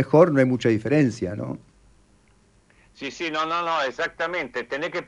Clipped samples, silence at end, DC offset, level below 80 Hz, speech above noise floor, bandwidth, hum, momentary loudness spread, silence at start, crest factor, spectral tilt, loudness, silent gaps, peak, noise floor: under 0.1%; 0.05 s; under 0.1%; -60 dBFS; 36 dB; 11 kHz; none; 16 LU; 0 s; 22 dB; -6.5 dB/octave; -23 LUFS; none; -2 dBFS; -59 dBFS